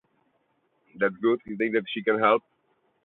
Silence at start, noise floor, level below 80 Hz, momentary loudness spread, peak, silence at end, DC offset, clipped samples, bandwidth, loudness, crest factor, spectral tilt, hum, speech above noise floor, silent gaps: 0.95 s; -71 dBFS; -72 dBFS; 6 LU; -8 dBFS; 0.65 s; under 0.1%; under 0.1%; 4.1 kHz; -25 LUFS; 20 dB; -9 dB/octave; none; 46 dB; none